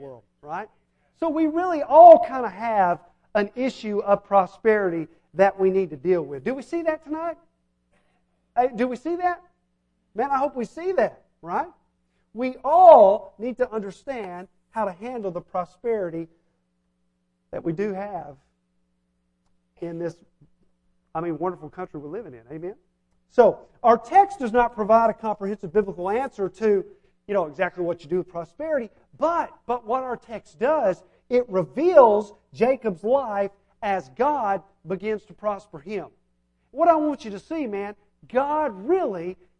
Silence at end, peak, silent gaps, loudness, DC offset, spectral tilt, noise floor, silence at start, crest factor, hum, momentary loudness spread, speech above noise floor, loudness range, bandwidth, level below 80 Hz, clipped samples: 0.25 s; 0 dBFS; none; -22 LUFS; under 0.1%; -7 dB/octave; -71 dBFS; 0 s; 22 dB; none; 17 LU; 50 dB; 15 LU; 8.8 kHz; -58 dBFS; under 0.1%